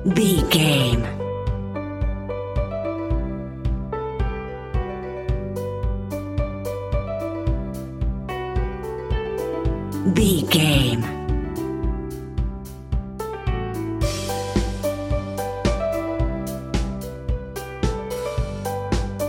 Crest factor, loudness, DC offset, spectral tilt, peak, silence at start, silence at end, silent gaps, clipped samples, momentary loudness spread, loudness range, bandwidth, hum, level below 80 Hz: 20 dB; -24 LUFS; under 0.1%; -5.5 dB/octave; -4 dBFS; 0 s; 0 s; none; under 0.1%; 11 LU; 6 LU; 17 kHz; none; -30 dBFS